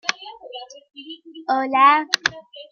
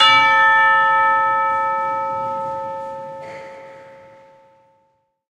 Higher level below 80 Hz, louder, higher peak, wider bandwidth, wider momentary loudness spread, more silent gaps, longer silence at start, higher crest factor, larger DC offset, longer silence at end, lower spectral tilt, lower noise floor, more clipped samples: about the same, -68 dBFS vs -66 dBFS; second, -18 LUFS vs -15 LUFS; about the same, 0 dBFS vs 0 dBFS; first, 15.5 kHz vs 10 kHz; first, 25 LU vs 21 LU; neither; about the same, 0.05 s vs 0 s; about the same, 22 dB vs 18 dB; neither; second, 0.1 s vs 1.4 s; about the same, -1 dB/octave vs -2 dB/octave; second, -39 dBFS vs -65 dBFS; neither